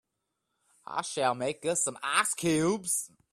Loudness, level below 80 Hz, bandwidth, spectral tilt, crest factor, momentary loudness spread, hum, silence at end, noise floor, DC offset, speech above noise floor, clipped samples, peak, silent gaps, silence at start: -29 LUFS; -70 dBFS; 16 kHz; -3 dB/octave; 22 dB; 7 LU; none; 0.25 s; -83 dBFS; under 0.1%; 53 dB; under 0.1%; -10 dBFS; none; 0.9 s